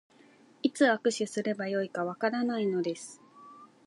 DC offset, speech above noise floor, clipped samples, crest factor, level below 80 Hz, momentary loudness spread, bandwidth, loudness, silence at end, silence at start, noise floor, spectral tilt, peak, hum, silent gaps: under 0.1%; 30 dB; under 0.1%; 20 dB; -84 dBFS; 9 LU; 11.5 kHz; -30 LUFS; 0.2 s; 0.65 s; -59 dBFS; -4.5 dB/octave; -12 dBFS; none; none